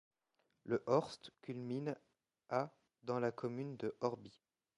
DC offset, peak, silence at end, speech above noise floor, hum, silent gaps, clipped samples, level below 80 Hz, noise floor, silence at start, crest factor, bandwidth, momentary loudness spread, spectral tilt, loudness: under 0.1%; -20 dBFS; 0.5 s; 43 dB; none; none; under 0.1%; -82 dBFS; -83 dBFS; 0.65 s; 22 dB; 10.5 kHz; 15 LU; -7 dB/octave; -41 LUFS